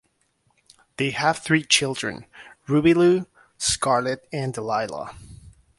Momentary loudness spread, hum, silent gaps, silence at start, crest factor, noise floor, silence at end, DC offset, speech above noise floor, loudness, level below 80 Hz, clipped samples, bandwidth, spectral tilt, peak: 16 LU; none; none; 1 s; 20 dB; -68 dBFS; 0.3 s; under 0.1%; 46 dB; -22 LUFS; -54 dBFS; under 0.1%; 11.5 kHz; -4 dB/octave; -4 dBFS